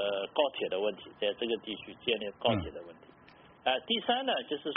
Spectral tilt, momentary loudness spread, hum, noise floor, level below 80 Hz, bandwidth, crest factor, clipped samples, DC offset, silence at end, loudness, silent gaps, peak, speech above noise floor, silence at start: -2 dB/octave; 7 LU; none; -58 dBFS; -62 dBFS; 4.3 kHz; 20 dB; under 0.1%; under 0.1%; 0 s; -32 LUFS; none; -12 dBFS; 25 dB; 0 s